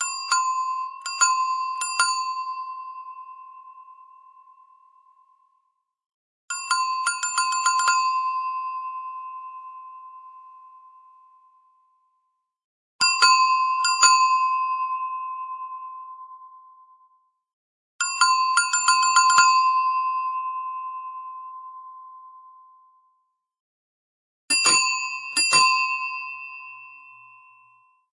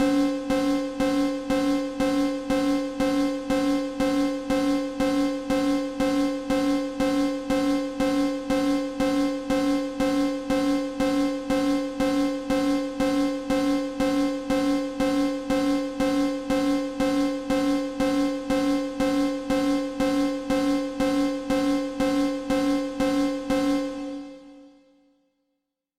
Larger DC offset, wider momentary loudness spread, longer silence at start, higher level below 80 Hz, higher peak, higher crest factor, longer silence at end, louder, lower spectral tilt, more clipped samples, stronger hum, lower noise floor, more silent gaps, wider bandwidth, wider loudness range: neither; first, 24 LU vs 2 LU; about the same, 0 s vs 0 s; second, -84 dBFS vs -46 dBFS; first, -2 dBFS vs -14 dBFS; first, 22 dB vs 10 dB; second, 1.1 s vs 1.3 s; first, -21 LUFS vs -25 LUFS; second, 3 dB/octave vs -5 dB/octave; neither; neither; second, -74 dBFS vs -80 dBFS; first, 6.14-6.48 s, 12.64-12.99 s, 17.53-17.99 s, 23.60-24.48 s vs none; second, 11.5 kHz vs 15 kHz; first, 17 LU vs 0 LU